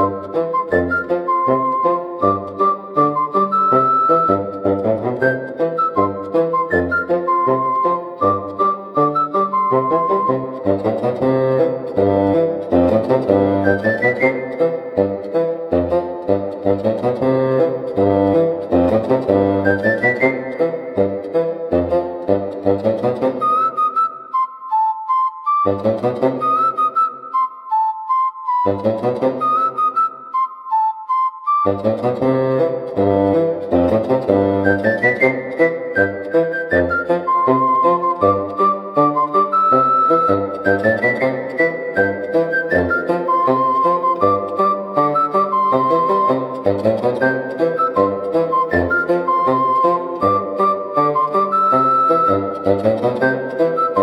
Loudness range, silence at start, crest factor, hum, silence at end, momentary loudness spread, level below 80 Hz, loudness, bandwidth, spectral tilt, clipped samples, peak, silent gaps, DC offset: 3 LU; 0 s; 16 dB; none; 0 s; 5 LU; -54 dBFS; -17 LUFS; 11 kHz; -8.5 dB/octave; under 0.1%; 0 dBFS; none; under 0.1%